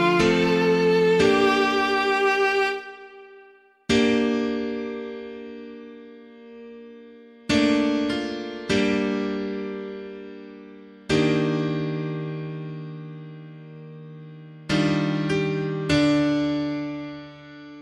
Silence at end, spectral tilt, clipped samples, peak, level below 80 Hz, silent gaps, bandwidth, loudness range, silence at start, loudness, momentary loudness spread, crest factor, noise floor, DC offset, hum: 0 s; -5.5 dB/octave; under 0.1%; -6 dBFS; -52 dBFS; none; 11.5 kHz; 8 LU; 0 s; -23 LUFS; 23 LU; 18 dB; -53 dBFS; under 0.1%; none